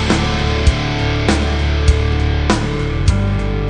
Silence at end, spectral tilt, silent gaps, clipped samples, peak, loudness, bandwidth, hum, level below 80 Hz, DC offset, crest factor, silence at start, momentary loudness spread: 0 s; -5.5 dB/octave; none; under 0.1%; 0 dBFS; -16 LUFS; 10 kHz; none; -18 dBFS; 0.7%; 14 dB; 0 s; 2 LU